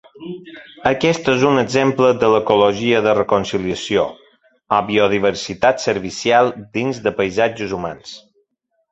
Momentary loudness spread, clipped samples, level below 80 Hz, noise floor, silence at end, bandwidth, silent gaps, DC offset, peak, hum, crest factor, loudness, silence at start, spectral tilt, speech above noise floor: 12 LU; under 0.1%; -50 dBFS; -68 dBFS; 0.75 s; 8.2 kHz; none; under 0.1%; 0 dBFS; none; 18 dB; -17 LUFS; 0.2 s; -5 dB/octave; 52 dB